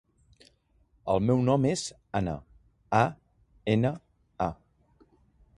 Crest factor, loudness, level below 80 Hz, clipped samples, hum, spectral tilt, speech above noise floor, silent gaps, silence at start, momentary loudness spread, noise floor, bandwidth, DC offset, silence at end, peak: 22 dB; -28 LUFS; -54 dBFS; under 0.1%; none; -6.5 dB/octave; 40 dB; none; 1.05 s; 12 LU; -67 dBFS; 11.5 kHz; under 0.1%; 1.05 s; -8 dBFS